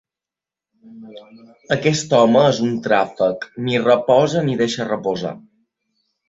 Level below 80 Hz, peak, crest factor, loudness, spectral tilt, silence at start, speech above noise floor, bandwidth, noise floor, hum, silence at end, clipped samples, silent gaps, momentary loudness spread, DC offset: -60 dBFS; -2 dBFS; 18 dB; -17 LUFS; -5.5 dB/octave; 0.9 s; 71 dB; 8 kHz; -88 dBFS; none; 0.9 s; under 0.1%; none; 12 LU; under 0.1%